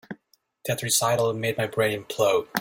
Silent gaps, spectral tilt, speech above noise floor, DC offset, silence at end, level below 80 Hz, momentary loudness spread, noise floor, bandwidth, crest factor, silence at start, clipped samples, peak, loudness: none; -3 dB/octave; 39 dB; under 0.1%; 0 s; -62 dBFS; 14 LU; -63 dBFS; 17 kHz; 22 dB; 0.1 s; under 0.1%; -2 dBFS; -24 LUFS